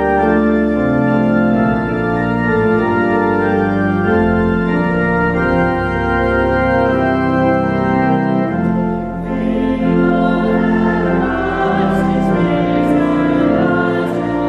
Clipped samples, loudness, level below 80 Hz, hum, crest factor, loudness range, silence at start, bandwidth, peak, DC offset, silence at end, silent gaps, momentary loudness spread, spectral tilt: under 0.1%; -15 LUFS; -32 dBFS; none; 12 dB; 1 LU; 0 s; 8.8 kHz; -2 dBFS; under 0.1%; 0 s; none; 3 LU; -9 dB/octave